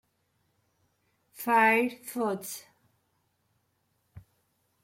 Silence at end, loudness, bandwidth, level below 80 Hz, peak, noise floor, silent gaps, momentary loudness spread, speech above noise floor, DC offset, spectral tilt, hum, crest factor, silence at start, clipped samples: 0.65 s; -27 LUFS; 16.5 kHz; -74 dBFS; -10 dBFS; -75 dBFS; none; 17 LU; 48 dB; under 0.1%; -4 dB/octave; none; 24 dB; 1.4 s; under 0.1%